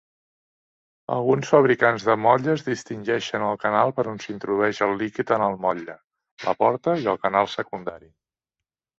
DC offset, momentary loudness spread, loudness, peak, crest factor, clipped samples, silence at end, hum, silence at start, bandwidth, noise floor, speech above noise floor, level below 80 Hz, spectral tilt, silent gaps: under 0.1%; 12 LU; -22 LUFS; -2 dBFS; 22 dB; under 0.1%; 1.05 s; none; 1.1 s; 8 kHz; -88 dBFS; 66 dB; -64 dBFS; -6 dB/octave; 6.04-6.08 s, 6.31-6.37 s